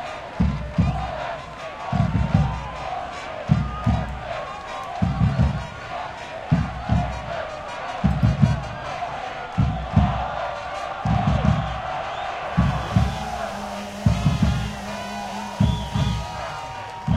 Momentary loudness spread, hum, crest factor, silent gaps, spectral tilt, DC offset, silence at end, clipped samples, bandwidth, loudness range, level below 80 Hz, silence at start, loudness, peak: 10 LU; none; 22 dB; none; -7 dB/octave; under 0.1%; 0 s; under 0.1%; 12.5 kHz; 1 LU; -32 dBFS; 0 s; -25 LUFS; -2 dBFS